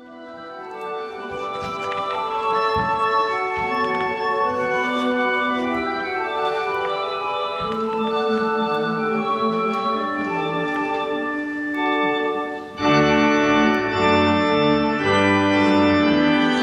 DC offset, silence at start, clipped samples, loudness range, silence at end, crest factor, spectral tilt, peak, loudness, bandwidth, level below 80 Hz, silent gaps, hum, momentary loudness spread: under 0.1%; 0 s; under 0.1%; 6 LU; 0 s; 16 dB; -5.5 dB/octave; -6 dBFS; -21 LUFS; 9.6 kHz; -52 dBFS; none; none; 10 LU